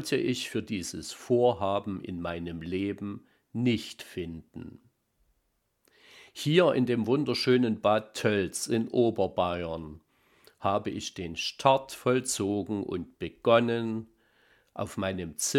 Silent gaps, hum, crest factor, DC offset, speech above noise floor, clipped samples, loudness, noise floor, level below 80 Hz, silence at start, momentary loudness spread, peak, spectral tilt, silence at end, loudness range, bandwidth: none; none; 24 dB; under 0.1%; 47 dB; under 0.1%; -29 LUFS; -76 dBFS; -60 dBFS; 0 s; 15 LU; -6 dBFS; -5 dB/octave; 0 s; 8 LU; 16.5 kHz